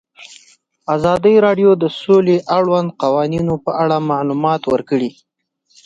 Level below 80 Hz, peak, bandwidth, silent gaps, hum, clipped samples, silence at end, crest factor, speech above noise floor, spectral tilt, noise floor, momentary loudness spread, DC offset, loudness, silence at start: -52 dBFS; -2 dBFS; 7.8 kHz; none; none; under 0.1%; 0.75 s; 14 dB; 48 dB; -7.5 dB/octave; -63 dBFS; 8 LU; under 0.1%; -15 LUFS; 0.2 s